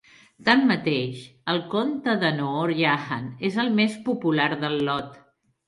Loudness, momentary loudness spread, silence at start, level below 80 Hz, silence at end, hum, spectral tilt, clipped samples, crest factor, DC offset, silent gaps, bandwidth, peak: -24 LUFS; 8 LU; 0.4 s; -66 dBFS; 0.55 s; none; -6.5 dB/octave; under 0.1%; 20 dB; under 0.1%; none; 11.5 kHz; -4 dBFS